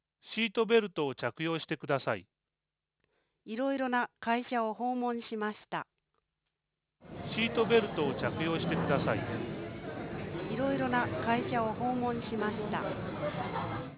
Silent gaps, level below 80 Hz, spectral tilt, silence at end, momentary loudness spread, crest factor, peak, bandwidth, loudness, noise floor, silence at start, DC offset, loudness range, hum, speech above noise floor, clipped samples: none; -60 dBFS; -4 dB/octave; 0 s; 12 LU; 20 dB; -14 dBFS; 4 kHz; -33 LUFS; under -90 dBFS; 0.25 s; under 0.1%; 4 LU; none; over 58 dB; under 0.1%